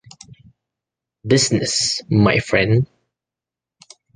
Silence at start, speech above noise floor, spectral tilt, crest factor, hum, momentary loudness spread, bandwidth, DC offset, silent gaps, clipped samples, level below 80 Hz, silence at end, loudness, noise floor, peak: 1.25 s; 71 dB; -4.5 dB/octave; 20 dB; none; 5 LU; 9.8 kHz; under 0.1%; none; under 0.1%; -46 dBFS; 1.3 s; -17 LUFS; -88 dBFS; -2 dBFS